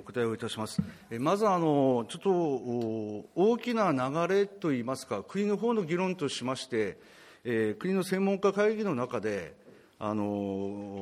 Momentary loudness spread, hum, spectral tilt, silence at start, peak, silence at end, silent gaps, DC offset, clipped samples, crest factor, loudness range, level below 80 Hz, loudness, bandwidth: 9 LU; none; -6 dB/octave; 0 s; -14 dBFS; 0 s; none; under 0.1%; under 0.1%; 16 dB; 3 LU; -70 dBFS; -30 LUFS; 15 kHz